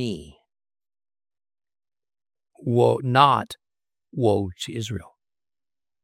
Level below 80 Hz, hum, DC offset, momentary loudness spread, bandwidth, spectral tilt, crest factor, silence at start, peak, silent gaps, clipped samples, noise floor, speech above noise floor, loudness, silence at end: -62 dBFS; none; under 0.1%; 19 LU; 15 kHz; -6 dB/octave; 24 dB; 0 s; -2 dBFS; none; under 0.1%; under -90 dBFS; over 68 dB; -22 LUFS; 1 s